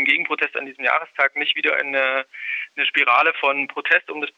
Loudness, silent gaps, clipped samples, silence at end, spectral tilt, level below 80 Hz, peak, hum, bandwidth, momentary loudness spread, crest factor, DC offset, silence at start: -19 LUFS; none; under 0.1%; 0.1 s; -3 dB/octave; -82 dBFS; -4 dBFS; none; 8.6 kHz; 8 LU; 18 dB; under 0.1%; 0 s